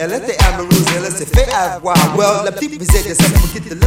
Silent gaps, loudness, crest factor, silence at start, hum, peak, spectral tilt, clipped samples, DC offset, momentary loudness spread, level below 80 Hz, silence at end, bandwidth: none; -14 LUFS; 12 dB; 0 s; none; 0 dBFS; -4.5 dB/octave; under 0.1%; under 0.1%; 7 LU; -18 dBFS; 0 s; 16.5 kHz